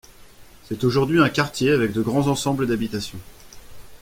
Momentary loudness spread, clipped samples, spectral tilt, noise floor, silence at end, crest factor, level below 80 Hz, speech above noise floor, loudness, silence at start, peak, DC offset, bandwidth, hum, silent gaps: 13 LU; under 0.1%; -5.5 dB/octave; -46 dBFS; 0.05 s; 20 dB; -48 dBFS; 25 dB; -21 LUFS; 0.2 s; -2 dBFS; under 0.1%; 16.5 kHz; none; none